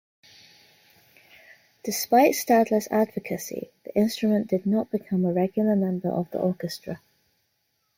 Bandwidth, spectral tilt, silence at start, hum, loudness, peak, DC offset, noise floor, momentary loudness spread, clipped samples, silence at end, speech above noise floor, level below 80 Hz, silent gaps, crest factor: 16.5 kHz; -5.5 dB/octave; 1.85 s; none; -24 LUFS; -6 dBFS; under 0.1%; -73 dBFS; 15 LU; under 0.1%; 1 s; 49 dB; -70 dBFS; none; 18 dB